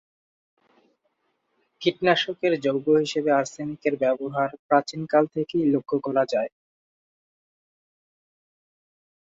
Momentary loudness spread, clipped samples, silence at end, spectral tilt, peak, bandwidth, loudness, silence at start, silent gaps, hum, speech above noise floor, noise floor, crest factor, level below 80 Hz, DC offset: 6 LU; under 0.1%; 2.9 s; -5.5 dB/octave; -6 dBFS; 8 kHz; -24 LUFS; 1.8 s; 4.59-4.69 s; none; 50 dB; -73 dBFS; 20 dB; -70 dBFS; under 0.1%